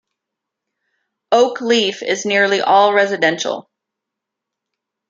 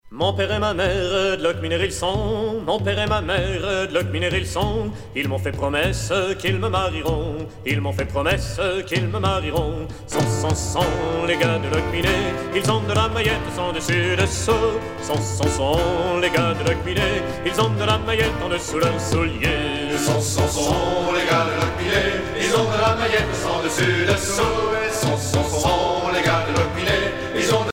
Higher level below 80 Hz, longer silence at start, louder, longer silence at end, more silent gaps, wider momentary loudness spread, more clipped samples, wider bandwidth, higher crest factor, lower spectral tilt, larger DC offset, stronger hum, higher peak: second, -70 dBFS vs -36 dBFS; first, 1.3 s vs 0.05 s; first, -15 LUFS vs -21 LUFS; first, 1.5 s vs 0 s; neither; first, 9 LU vs 5 LU; neither; second, 7.8 kHz vs 16.5 kHz; about the same, 16 dB vs 18 dB; second, -3 dB/octave vs -4.5 dB/octave; neither; neither; about the same, -2 dBFS vs -4 dBFS